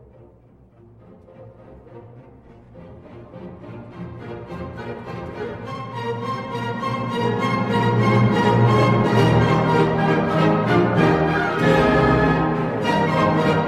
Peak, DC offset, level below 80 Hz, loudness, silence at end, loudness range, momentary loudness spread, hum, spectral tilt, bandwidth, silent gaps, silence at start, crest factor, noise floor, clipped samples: -4 dBFS; under 0.1%; -42 dBFS; -19 LUFS; 0 s; 19 LU; 18 LU; none; -7.5 dB/octave; 11 kHz; none; 1.4 s; 16 dB; -50 dBFS; under 0.1%